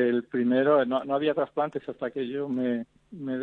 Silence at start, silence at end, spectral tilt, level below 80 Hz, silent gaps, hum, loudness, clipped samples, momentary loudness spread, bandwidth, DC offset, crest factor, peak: 0 s; 0 s; -8.5 dB/octave; -72 dBFS; none; none; -27 LUFS; under 0.1%; 11 LU; 4.3 kHz; under 0.1%; 16 dB; -10 dBFS